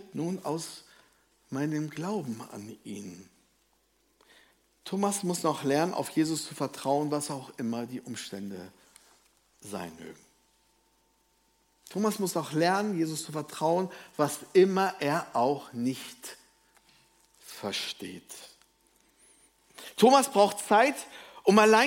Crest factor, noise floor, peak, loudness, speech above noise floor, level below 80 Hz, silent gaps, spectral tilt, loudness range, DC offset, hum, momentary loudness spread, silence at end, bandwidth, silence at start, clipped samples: 24 dB; -70 dBFS; -6 dBFS; -29 LUFS; 42 dB; -76 dBFS; none; -4.5 dB/octave; 14 LU; under 0.1%; none; 21 LU; 0 s; 16.5 kHz; 0.15 s; under 0.1%